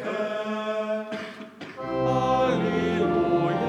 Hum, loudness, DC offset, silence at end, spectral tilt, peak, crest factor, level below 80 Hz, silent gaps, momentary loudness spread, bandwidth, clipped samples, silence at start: none; -25 LUFS; under 0.1%; 0 s; -7 dB/octave; -10 dBFS; 14 dB; -54 dBFS; none; 13 LU; 10 kHz; under 0.1%; 0 s